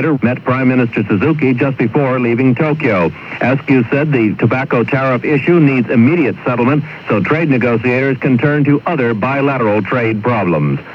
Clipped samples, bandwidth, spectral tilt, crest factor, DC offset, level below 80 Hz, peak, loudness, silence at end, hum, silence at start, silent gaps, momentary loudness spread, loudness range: under 0.1%; 6.2 kHz; -9.5 dB/octave; 12 dB; under 0.1%; -52 dBFS; 0 dBFS; -13 LUFS; 0 s; none; 0 s; none; 4 LU; 1 LU